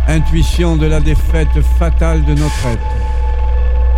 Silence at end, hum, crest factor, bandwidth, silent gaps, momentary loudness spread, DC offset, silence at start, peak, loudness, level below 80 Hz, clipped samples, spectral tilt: 0 s; none; 10 dB; 11.5 kHz; none; 4 LU; under 0.1%; 0 s; 0 dBFS; -14 LUFS; -12 dBFS; under 0.1%; -6.5 dB/octave